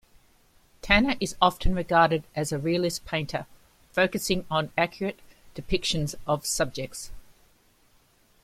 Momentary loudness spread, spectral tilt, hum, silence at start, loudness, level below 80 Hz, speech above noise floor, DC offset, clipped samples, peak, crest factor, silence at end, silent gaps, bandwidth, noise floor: 14 LU; -4 dB/octave; none; 0.85 s; -26 LUFS; -40 dBFS; 36 dB; under 0.1%; under 0.1%; -4 dBFS; 24 dB; 1.25 s; none; 16 kHz; -62 dBFS